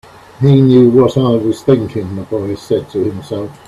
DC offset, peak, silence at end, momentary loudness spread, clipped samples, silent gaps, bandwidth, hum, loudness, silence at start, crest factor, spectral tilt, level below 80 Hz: under 0.1%; 0 dBFS; 0.15 s; 13 LU; under 0.1%; none; 12.5 kHz; none; -13 LUFS; 0.4 s; 12 dB; -8.5 dB/octave; -46 dBFS